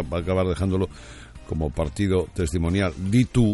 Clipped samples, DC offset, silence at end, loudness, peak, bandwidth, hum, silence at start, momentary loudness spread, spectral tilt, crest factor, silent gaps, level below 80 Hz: under 0.1%; under 0.1%; 0 s; -24 LUFS; -6 dBFS; 11.5 kHz; none; 0 s; 11 LU; -7 dB/octave; 16 dB; none; -38 dBFS